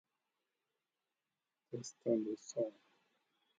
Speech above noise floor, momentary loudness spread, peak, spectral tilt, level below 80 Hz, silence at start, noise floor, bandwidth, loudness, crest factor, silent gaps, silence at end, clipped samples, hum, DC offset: over 50 dB; 11 LU; -22 dBFS; -6 dB/octave; under -90 dBFS; 1.7 s; under -90 dBFS; 9 kHz; -41 LUFS; 22 dB; none; 0.9 s; under 0.1%; none; under 0.1%